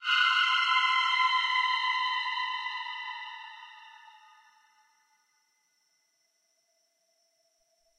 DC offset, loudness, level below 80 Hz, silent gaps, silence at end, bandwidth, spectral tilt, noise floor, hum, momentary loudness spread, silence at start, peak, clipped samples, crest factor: under 0.1%; -26 LUFS; under -90 dBFS; none; 4.05 s; 10 kHz; 8 dB/octave; -74 dBFS; none; 19 LU; 0 s; -14 dBFS; under 0.1%; 18 dB